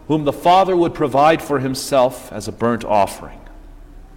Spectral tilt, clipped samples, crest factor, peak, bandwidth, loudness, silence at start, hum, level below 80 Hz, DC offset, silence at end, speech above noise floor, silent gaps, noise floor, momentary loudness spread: -5.5 dB/octave; under 0.1%; 14 dB; -4 dBFS; 17 kHz; -17 LUFS; 0.1 s; none; -42 dBFS; under 0.1%; 0 s; 22 dB; none; -38 dBFS; 14 LU